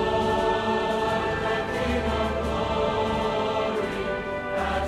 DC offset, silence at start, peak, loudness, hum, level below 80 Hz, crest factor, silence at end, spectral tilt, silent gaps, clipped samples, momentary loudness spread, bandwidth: under 0.1%; 0 s; -12 dBFS; -26 LUFS; none; -38 dBFS; 14 dB; 0 s; -5.5 dB/octave; none; under 0.1%; 4 LU; 14 kHz